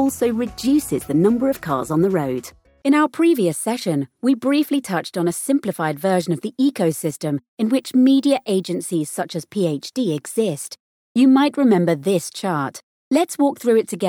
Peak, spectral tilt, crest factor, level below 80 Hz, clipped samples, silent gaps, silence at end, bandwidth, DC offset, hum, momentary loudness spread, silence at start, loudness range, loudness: -4 dBFS; -5.5 dB/octave; 14 dB; -56 dBFS; under 0.1%; 7.48-7.57 s, 10.80-11.15 s, 12.83-13.11 s; 0 s; 17 kHz; under 0.1%; none; 9 LU; 0 s; 2 LU; -20 LUFS